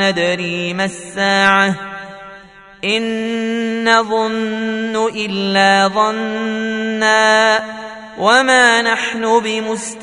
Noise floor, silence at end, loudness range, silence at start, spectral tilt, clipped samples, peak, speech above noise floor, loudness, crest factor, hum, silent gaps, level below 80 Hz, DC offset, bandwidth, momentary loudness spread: -39 dBFS; 0 s; 4 LU; 0 s; -3.5 dB/octave; under 0.1%; 0 dBFS; 24 dB; -15 LUFS; 16 dB; none; none; -58 dBFS; under 0.1%; 11 kHz; 11 LU